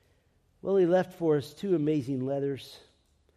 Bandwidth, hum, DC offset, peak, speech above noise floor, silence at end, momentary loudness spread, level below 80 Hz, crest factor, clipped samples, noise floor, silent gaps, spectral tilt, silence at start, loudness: 13.5 kHz; none; under 0.1%; -14 dBFS; 40 dB; 0.6 s; 13 LU; -68 dBFS; 16 dB; under 0.1%; -68 dBFS; none; -8 dB/octave; 0.65 s; -29 LUFS